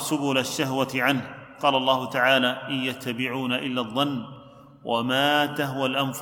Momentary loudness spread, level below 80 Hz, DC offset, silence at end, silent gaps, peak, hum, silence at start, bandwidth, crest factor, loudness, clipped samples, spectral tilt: 8 LU; -68 dBFS; under 0.1%; 0 s; none; -6 dBFS; none; 0 s; 19 kHz; 20 dB; -24 LUFS; under 0.1%; -4 dB/octave